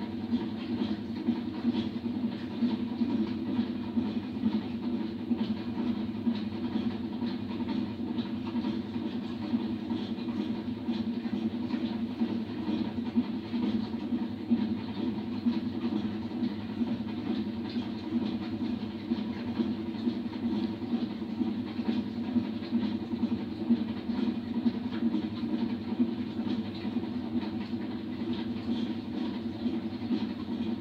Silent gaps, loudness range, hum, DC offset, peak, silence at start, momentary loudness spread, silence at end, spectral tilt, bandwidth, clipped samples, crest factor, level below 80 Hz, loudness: none; 2 LU; none; under 0.1%; -16 dBFS; 0 s; 3 LU; 0 s; -8 dB/octave; 6 kHz; under 0.1%; 16 dB; -64 dBFS; -33 LUFS